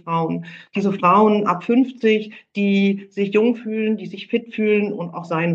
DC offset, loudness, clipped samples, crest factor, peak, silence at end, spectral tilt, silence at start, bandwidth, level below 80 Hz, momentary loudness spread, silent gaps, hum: under 0.1%; -20 LUFS; under 0.1%; 16 dB; -2 dBFS; 0 s; -8 dB/octave; 0.05 s; 7.2 kHz; -74 dBFS; 10 LU; none; none